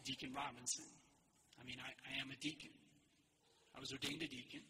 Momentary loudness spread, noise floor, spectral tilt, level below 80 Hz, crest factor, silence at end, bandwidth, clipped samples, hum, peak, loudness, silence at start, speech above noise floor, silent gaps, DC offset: 14 LU; -77 dBFS; -2 dB/octave; -78 dBFS; 22 dB; 0 s; 15.5 kHz; under 0.1%; none; -30 dBFS; -47 LUFS; 0 s; 27 dB; none; under 0.1%